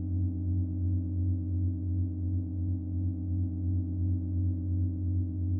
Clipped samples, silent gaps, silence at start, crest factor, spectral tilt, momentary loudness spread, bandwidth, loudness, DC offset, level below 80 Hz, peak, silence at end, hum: under 0.1%; none; 0 s; 10 dB; -17.5 dB/octave; 2 LU; 0.9 kHz; -32 LUFS; under 0.1%; -44 dBFS; -20 dBFS; 0 s; none